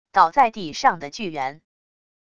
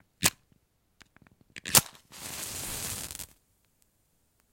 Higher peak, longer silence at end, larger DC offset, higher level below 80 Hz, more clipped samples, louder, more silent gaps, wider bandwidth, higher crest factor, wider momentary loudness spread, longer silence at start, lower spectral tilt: about the same, -2 dBFS vs 0 dBFS; second, 0.8 s vs 1.25 s; first, 0.5% vs under 0.1%; about the same, -60 dBFS vs -58 dBFS; neither; first, -21 LUFS vs -28 LUFS; neither; second, 7.6 kHz vs 17 kHz; second, 22 dB vs 34 dB; second, 13 LU vs 22 LU; about the same, 0.15 s vs 0.2 s; first, -3.5 dB/octave vs -1 dB/octave